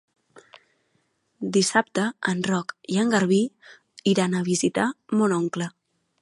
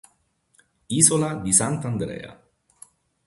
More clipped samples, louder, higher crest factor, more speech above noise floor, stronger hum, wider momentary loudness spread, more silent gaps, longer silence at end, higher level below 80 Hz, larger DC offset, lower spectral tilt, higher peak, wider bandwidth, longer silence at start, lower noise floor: neither; second, -24 LUFS vs -20 LUFS; about the same, 22 dB vs 24 dB; about the same, 47 dB vs 44 dB; neither; second, 8 LU vs 18 LU; neither; second, 0.55 s vs 0.95 s; second, -68 dBFS vs -54 dBFS; neither; about the same, -4.5 dB/octave vs -4 dB/octave; about the same, -4 dBFS vs -2 dBFS; about the same, 11.5 kHz vs 12 kHz; first, 1.4 s vs 0.9 s; first, -70 dBFS vs -66 dBFS